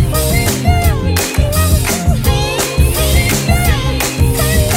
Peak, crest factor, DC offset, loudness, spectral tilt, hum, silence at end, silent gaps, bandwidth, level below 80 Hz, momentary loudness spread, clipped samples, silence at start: 0 dBFS; 12 dB; under 0.1%; -13 LUFS; -4.5 dB/octave; none; 0 s; none; 16.5 kHz; -16 dBFS; 2 LU; under 0.1%; 0 s